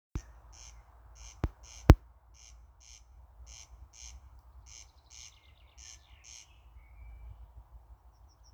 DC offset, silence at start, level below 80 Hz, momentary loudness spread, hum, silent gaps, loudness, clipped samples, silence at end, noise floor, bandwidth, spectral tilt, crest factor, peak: under 0.1%; 0.15 s; -38 dBFS; 29 LU; none; none; -29 LUFS; under 0.1%; 6.6 s; -59 dBFS; over 20 kHz; -6.5 dB/octave; 36 dB; 0 dBFS